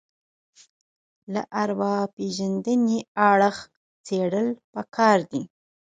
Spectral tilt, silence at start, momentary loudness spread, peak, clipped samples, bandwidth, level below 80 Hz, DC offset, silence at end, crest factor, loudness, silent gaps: -5.5 dB/octave; 1.3 s; 13 LU; -4 dBFS; under 0.1%; 9.2 kHz; -70 dBFS; under 0.1%; 0.45 s; 20 dB; -24 LUFS; 2.13-2.17 s, 3.08-3.15 s, 3.76-4.04 s, 4.64-4.73 s